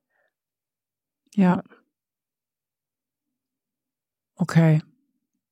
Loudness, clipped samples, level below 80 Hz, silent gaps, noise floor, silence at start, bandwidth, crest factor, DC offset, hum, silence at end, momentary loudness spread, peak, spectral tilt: -22 LUFS; under 0.1%; -74 dBFS; none; under -90 dBFS; 1.35 s; 10.5 kHz; 22 dB; under 0.1%; none; 0.7 s; 11 LU; -6 dBFS; -8.5 dB/octave